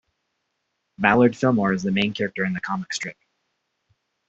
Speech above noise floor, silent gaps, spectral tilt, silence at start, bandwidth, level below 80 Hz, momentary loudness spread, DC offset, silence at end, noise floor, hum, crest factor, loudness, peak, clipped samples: 55 dB; none; -5.5 dB/octave; 1 s; 8 kHz; -58 dBFS; 11 LU; under 0.1%; 1.15 s; -76 dBFS; none; 22 dB; -22 LUFS; -2 dBFS; under 0.1%